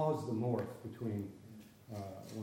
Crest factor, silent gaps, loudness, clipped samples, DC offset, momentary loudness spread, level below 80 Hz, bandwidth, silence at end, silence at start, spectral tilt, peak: 18 dB; none; -41 LUFS; under 0.1%; under 0.1%; 18 LU; -74 dBFS; 16.5 kHz; 0 s; 0 s; -8 dB/octave; -22 dBFS